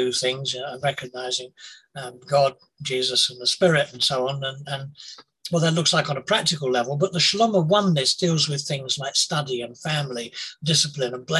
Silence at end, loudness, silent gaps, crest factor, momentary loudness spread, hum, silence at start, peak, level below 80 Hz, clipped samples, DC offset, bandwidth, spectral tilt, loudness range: 0 s; -22 LUFS; none; 18 dB; 13 LU; none; 0 s; -4 dBFS; -64 dBFS; under 0.1%; under 0.1%; 12.5 kHz; -3.5 dB/octave; 3 LU